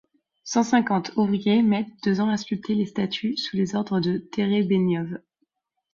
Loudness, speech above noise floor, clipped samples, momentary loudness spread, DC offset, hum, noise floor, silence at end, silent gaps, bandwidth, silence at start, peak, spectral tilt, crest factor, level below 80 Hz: -24 LUFS; 51 dB; under 0.1%; 6 LU; under 0.1%; none; -74 dBFS; 0.75 s; none; 7.4 kHz; 0.45 s; -8 dBFS; -6 dB/octave; 16 dB; -64 dBFS